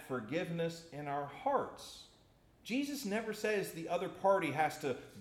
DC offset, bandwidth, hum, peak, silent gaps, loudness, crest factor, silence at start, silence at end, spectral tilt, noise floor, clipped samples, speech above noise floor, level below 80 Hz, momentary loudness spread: under 0.1%; 16.5 kHz; none; -18 dBFS; none; -37 LUFS; 18 dB; 0 s; 0 s; -5 dB/octave; -66 dBFS; under 0.1%; 29 dB; -72 dBFS; 13 LU